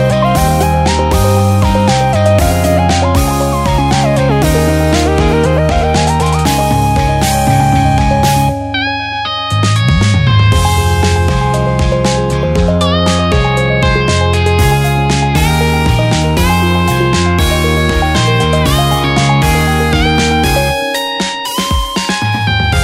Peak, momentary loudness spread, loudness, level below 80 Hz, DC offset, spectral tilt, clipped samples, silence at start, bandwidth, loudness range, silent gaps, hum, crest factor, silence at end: 0 dBFS; 4 LU; -11 LUFS; -20 dBFS; under 0.1%; -5 dB/octave; under 0.1%; 0 s; 16.5 kHz; 1 LU; none; none; 10 dB; 0 s